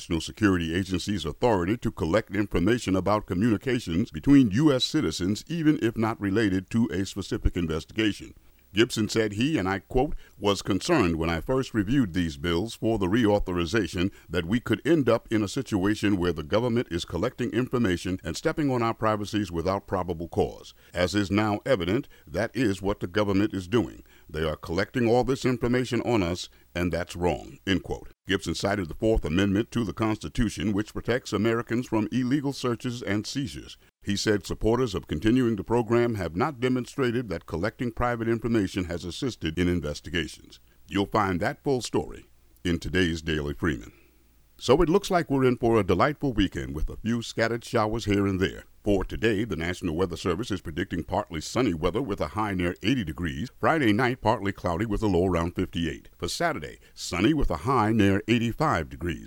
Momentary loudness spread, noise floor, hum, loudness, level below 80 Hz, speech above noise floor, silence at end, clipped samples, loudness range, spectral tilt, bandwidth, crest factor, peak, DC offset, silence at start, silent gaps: 8 LU; -59 dBFS; none; -27 LUFS; -42 dBFS; 33 dB; 0 s; under 0.1%; 4 LU; -6 dB/octave; 16.5 kHz; 22 dB; -6 dBFS; under 0.1%; 0 s; none